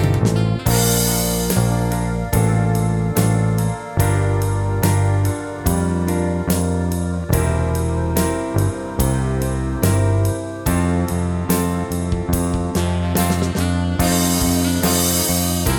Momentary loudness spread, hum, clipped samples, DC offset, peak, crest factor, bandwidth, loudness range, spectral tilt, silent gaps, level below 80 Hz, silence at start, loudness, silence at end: 5 LU; none; under 0.1%; under 0.1%; -2 dBFS; 16 dB; 19 kHz; 2 LU; -5.5 dB/octave; none; -30 dBFS; 0 s; -19 LUFS; 0 s